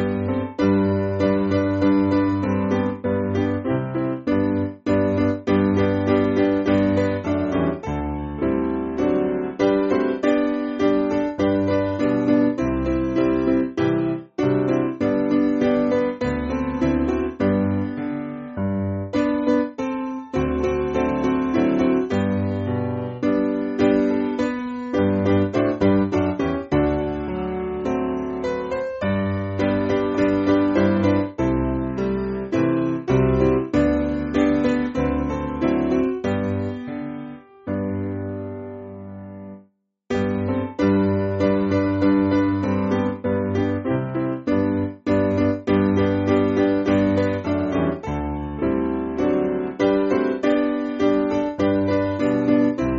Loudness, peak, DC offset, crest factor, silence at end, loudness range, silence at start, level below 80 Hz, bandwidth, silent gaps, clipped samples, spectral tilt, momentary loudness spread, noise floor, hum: -21 LUFS; -6 dBFS; under 0.1%; 14 dB; 0 s; 4 LU; 0 s; -40 dBFS; 7.6 kHz; none; under 0.1%; -7 dB/octave; 7 LU; -58 dBFS; none